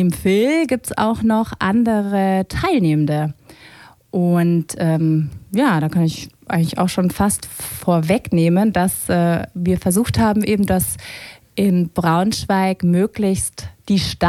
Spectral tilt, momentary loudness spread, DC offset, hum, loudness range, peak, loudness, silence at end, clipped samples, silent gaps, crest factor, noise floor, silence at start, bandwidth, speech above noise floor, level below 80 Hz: -6 dB/octave; 7 LU; under 0.1%; none; 2 LU; -2 dBFS; -18 LUFS; 0 s; under 0.1%; none; 16 dB; -44 dBFS; 0 s; 15.5 kHz; 27 dB; -42 dBFS